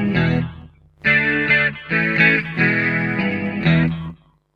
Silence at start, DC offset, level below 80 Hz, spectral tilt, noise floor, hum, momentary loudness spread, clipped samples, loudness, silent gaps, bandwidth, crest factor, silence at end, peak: 0 s; under 0.1%; -44 dBFS; -8 dB/octave; -42 dBFS; none; 8 LU; under 0.1%; -17 LUFS; none; 5.2 kHz; 18 dB; 0.4 s; -2 dBFS